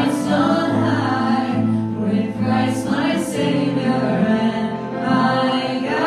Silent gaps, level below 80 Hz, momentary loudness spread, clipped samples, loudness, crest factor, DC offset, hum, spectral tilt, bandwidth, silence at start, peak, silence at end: none; -54 dBFS; 4 LU; under 0.1%; -19 LUFS; 14 dB; under 0.1%; none; -6.5 dB/octave; 13.5 kHz; 0 s; -4 dBFS; 0 s